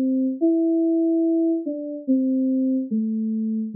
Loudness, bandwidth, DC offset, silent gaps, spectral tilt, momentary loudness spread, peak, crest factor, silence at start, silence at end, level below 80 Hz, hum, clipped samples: -22 LUFS; 0.7 kHz; under 0.1%; none; -5 dB/octave; 5 LU; -12 dBFS; 10 dB; 0 s; 0 s; -88 dBFS; none; under 0.1%